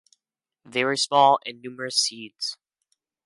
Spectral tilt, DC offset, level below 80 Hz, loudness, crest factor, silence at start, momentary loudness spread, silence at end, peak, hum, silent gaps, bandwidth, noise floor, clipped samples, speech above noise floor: -2 dB/octave; under 0.1%; -78 dBFS; -23 LUFS; 20 dB; 0.7 s; 13 LU; 0.7 s; -6 dBFS; none; none; 11.5 kHz; -86 dBFS; under 0.1%; 62 dB